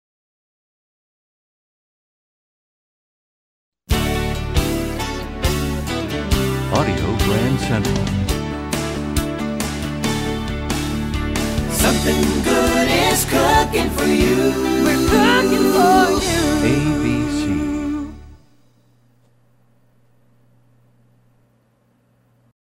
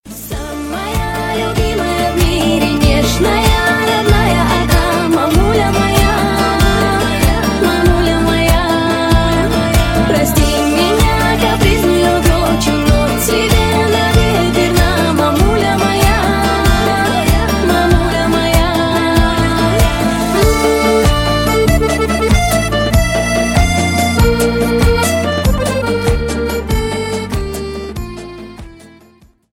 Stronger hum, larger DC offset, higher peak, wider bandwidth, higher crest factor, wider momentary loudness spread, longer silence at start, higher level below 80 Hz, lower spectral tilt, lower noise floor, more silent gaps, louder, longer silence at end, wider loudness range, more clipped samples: neither; neither; second, -4 dBFS vs 0 dBFS; about the same, 16.5 kHz vs 17 kHz; about the same, 16 dB vs 12 dB; first, 9 LU vs 6 LU; first, 3.9 s vs 0.05 s; second, -30 dBFS vs -18 dBFS; about the same, -5 dB/octave vs -5 dB/octave; first, -60 dBFS vs -46 dBFS; neither; second, -18 LUFS vs -13 LUFS; first, 4.25 s vs 0.65 s; first, 10 LU vs 3 LU; neither